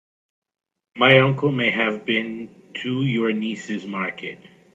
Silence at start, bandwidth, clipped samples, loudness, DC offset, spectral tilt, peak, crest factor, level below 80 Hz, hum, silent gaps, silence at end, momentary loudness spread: 0.95 s; 7.8 kHz; under 0.1%; -20 LUFS; under 0.1%; -6.5 dB/octave; 0 dBFS; 22 dB; -64 dBFS; none; none; 0.3 s; 18 LU